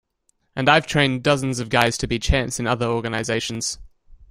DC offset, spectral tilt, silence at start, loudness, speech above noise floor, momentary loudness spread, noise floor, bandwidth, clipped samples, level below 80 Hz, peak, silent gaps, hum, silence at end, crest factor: under 0.1%; -4 dB/octave; 0.55 s; -21 LUFS; 47 dB; 9 LU; -68 dBFS; 16 kHz; under 0.1%; -34 dBFS; -2 dBFS; none; none; 0.15 s; 20 dB